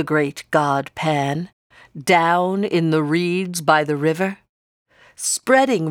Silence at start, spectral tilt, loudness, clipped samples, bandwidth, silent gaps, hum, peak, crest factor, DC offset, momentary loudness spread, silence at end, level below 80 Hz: 0 s; -4.5 dB/octave; -19 LUFS; under 0.1%; 18 kHz; 1.53-1.70 s, 4.49-4.86 s; none; -2 dBFS; 18 dB; under 0.1%; 9 LU; 0 s; -64 dBFS